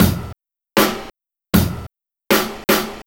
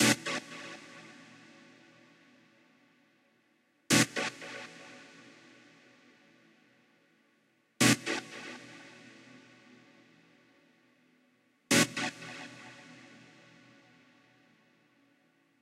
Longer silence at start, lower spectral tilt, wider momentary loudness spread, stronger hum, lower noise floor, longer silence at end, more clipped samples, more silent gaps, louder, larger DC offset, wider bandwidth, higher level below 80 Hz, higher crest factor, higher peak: about the same, 0 s vs 0 s; first, -4.5 dB/octave vs -3 dB/octave; second, 15 LU vs 29 LU; neither; second, -42 dBFS vs -71 dBFS; second, 0.05 s vs 2.9 s; neither; neither; first, -18 LUFS vs -30 LUFS; neither; first, over 20 kHz vs 15.5 kHz; first, -36 dBFS vs -74 dBFS; second, 20 dB vs 26 dB; first, 0 dBFS vs -10 dBFS